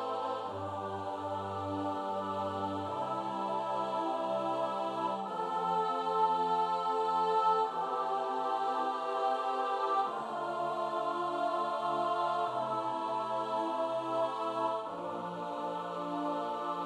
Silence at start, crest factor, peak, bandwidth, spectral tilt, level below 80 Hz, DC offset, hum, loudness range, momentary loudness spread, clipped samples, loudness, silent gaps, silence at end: 0 s; 16 dB; -18 dBFS; 12 kHz; -5.5 dB/octave; -82 dBFS; under 0.1%; none; 4 LU; 7 LU; under 0.1%; -34 LUFS; none; 0 s